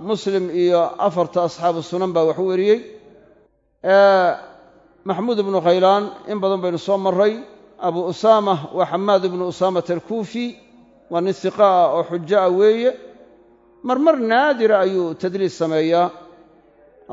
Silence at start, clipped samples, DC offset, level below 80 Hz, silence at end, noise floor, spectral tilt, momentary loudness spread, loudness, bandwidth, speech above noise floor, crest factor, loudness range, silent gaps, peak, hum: 0 s; under 0.1%; under 0.1%; -66 dBFS; 0 s; -58 dBFS; -6 dB/octave; 10 LU; -18 LUFS; 7.8 kHz; 40 dB; 18 dB; 2 LU; none; -2 dBFS; none